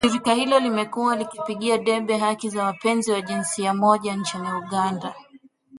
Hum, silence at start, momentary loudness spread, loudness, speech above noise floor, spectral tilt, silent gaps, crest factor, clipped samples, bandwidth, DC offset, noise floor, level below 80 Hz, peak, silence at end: none; 0 s; 7 LU; -23 LUFS; 30 dB; -4 dB/octave; none; 20 dB; under 0.1%; 11.5 kHz; under 0.1%; -52 dBFS; -62 dBFS; -4 dBFS; 0 s